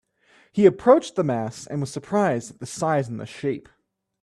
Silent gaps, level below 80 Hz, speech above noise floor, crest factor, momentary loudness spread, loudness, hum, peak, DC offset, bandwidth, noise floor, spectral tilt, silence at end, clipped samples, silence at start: none; -62 dBFS; 37 dB; 20 dB; 13 LU; -23 LUFS; none; -2 dBFS; under 0.1%; 12.5 kHz; -59 dBFS; -6.5 dB/octave; 0.6 s; under 0.1%; 0.55 s